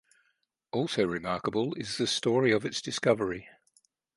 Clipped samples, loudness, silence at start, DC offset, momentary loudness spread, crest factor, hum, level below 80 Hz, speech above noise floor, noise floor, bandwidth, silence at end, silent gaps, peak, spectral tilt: under 0.1%; -29 LUFS; 0.75 s; under 0.1%; 8 LU; 22 dB; none; -64 dBFS; 47 dB; -76 dBFS; 11.5 kHz; 0.65 s; none; -10 dBFS; -4.5 dB/octave